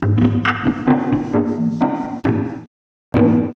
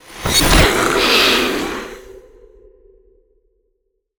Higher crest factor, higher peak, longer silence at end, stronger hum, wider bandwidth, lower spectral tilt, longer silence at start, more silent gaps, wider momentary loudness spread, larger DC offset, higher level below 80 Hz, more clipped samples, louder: about the same, 14 dB vs 18 dB; about the same, -2 dBFS vs 0 dBFS; second, 0.05 s vs 2 s; neither; second, 6.4 kHz vs over 20 kHz; first, -9 dB/octave vs -3 dB/octave; about the same, 0 s vs 0.1 s; first, 2.67-3.12 s vs none; second, 7 LU vs 15 LU; neither; second, -42 dBFS vs -28 dBFS; neither; second, -18 LUFS vs -13 LUFS